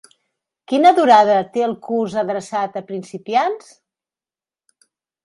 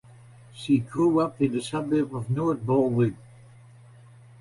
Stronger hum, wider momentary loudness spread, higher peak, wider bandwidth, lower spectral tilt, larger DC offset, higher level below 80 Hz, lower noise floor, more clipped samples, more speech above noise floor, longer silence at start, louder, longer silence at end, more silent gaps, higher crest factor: neither; first, 16 LU vs 6 LU; first, 0 dBFS vs -10 dBFS; about the same, 11.5 kHz vs 11.5 kHz; second, -5 dB/octave vs -7.5 dB/octave; neither; second, -70 dBFS vs -58 dBFS; first, under -90 dBFS vs -50 dBFS; neither; first, over 73 dB vs 26 dB; first, 0.7 s vs 0.55 s; first, -17 LUFS vs -25 LUFS; first, 1.65 s vs 1.25 s; neither; about the same, 18 dB vs 16 dB